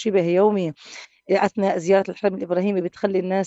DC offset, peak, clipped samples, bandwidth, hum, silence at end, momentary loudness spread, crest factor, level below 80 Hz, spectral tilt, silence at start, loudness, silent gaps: under 0.1%; -4 dBFS; under 0.1%; 8 kHz; none; 0 s; 11 LU; 16 dB; -68 dBFS; -6.5 dB/octave; 0 s; -21 LUFS; none